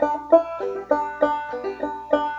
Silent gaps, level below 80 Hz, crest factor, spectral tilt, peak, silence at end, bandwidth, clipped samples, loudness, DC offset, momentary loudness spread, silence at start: none; -56 dBFS; 20 dB; -6 dB/octave; -2 dBFS; 0 s; 7.6 kHz; under 0.1%; -23 LUFS; under 0.1%; 11 LU; 0 s